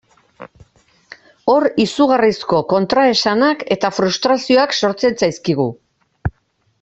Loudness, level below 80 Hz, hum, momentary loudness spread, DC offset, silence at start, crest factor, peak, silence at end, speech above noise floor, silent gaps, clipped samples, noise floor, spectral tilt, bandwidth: -15 LUFS; -46 dBFS; none; 9 LU; under 0.1%; 0.4 s; 14 dB; -2 dBFS; 0.5 s; 47 dB; none; under 0.1%; -62 dBFS; -5 dB/octave; 8.2 kHz